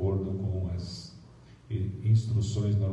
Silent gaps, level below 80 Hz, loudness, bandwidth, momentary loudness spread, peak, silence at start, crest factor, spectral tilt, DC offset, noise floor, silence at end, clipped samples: none; -54 dBFS; -30 LUFS; 8.4 kHz; 14 LU; -14 dBFS; 0 s; 14 dB; -8 dB/octave; under 0.1%; -52 dBFS; 0 s; under 0.1%